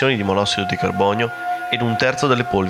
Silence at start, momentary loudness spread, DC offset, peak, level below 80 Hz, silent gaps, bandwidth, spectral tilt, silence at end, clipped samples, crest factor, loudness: 0 s; 4 LU; under 0.1%; -4 dBFS; -52 dBFS; none; 15.5 kHz; -5 dB/octave; 0 s; under 0.1%; 16 dB; -19 LUFS